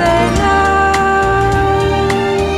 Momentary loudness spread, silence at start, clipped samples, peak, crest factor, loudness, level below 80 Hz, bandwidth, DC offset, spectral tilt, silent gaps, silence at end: 3 LU; 0 s; under 0.1%; -2 dBFS; 12 dB; -12 LUFS; -24 dBFS; 13.5 kHz; under 0.1%; -5.5 dB/octave; none; 0 s